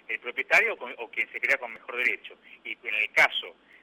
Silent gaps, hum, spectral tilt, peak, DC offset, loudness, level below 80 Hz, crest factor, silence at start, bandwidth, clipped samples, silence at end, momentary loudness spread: none; none; -1 dB/octave; -8 dBFS; under 0.1%; -26 LUFS; -76 dBFS; 22 dB; 0.1 s; 16.5 kHz; under 0.1%; 0.3 s; 16 LU